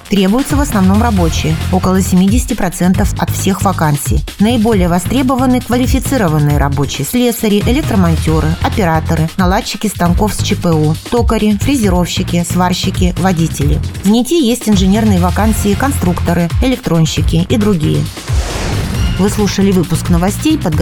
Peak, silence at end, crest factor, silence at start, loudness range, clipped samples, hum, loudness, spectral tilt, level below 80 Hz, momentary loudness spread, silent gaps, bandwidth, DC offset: 0 dBFS; 0 s; 12 dB; 0.05 s; 1 LU; under 0.1%; none; -12 LUFS; -6 dB/octave; -22 dBFS; 4 LU; none; 19.5 kHz; 0.1%